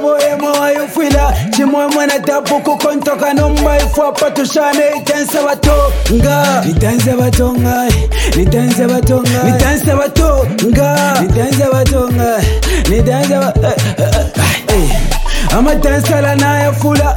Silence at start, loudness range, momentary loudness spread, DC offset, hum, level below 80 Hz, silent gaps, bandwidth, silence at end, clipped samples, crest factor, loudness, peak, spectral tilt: 0 s; 1 LU; 3 LU; under 0.1%; none; -18 dBFS; none; 19 kHz; 0 s; under 0.1%; 10 dB; -12 LUFS; 0 dBFS; -5.5 dB/octave